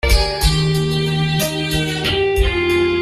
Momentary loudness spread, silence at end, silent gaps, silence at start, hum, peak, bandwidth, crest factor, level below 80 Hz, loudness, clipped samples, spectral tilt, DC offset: 2 LU; 0 s; none; 0.05 s; none; -2 dBFS; 15.5 kHz; 14 dB; -22 dBFS; -17 LUFS; under 0.1%; -5 dB/octave; under 0.1%